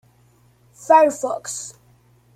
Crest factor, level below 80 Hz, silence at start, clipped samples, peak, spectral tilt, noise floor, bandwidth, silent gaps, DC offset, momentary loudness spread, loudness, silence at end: 20 dB; -66 dBFS; 0.9 s; under 0.1%; -2 dBFS; -3 dB/octave; -56 dBFS; 15 kHz; none; under 0.1%; 21 LU; -18 LUFS; 0.65 s